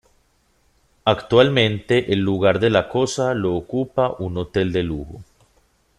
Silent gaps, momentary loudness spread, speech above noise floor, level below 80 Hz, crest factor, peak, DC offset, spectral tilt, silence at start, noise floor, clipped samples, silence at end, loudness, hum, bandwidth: none; 8 LU; 43 dB; -46 dBFS; 20 dB; 0 dBFS; under 0.1%; -6 dB/octave; 1.05 s; -62 dBFS; under 0.1%; 0.75 s; -20 LUFS; none; 12 kHz